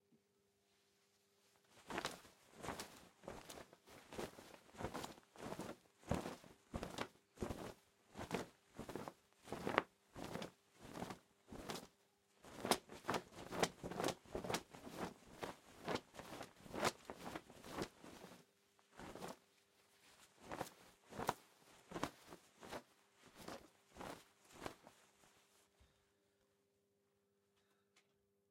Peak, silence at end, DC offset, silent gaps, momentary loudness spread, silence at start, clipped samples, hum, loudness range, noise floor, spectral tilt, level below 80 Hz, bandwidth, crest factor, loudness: -14 dBFS; 0.5 s; under 0.1%; none; 21 LU; 0.1 s; under 0.1%; none; 12 LU; -82 dBFS; -4 dB/octave; -70 dBFS; 16.5 kHz; 38 dB; -49 LUFS